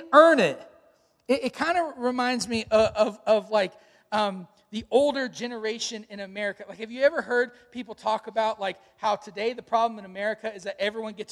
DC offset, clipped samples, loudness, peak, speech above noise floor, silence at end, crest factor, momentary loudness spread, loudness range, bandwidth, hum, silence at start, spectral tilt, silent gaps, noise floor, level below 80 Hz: under 0.1%; under 0.1%; -26 LUFS; -4 dBFS; 37 dB; 0.05 s; 22 dB; 12 LU; 4 LU; 12 kHz; none; 0 s; -4 dB/octave; none; -62 dBFS; -62 dBFS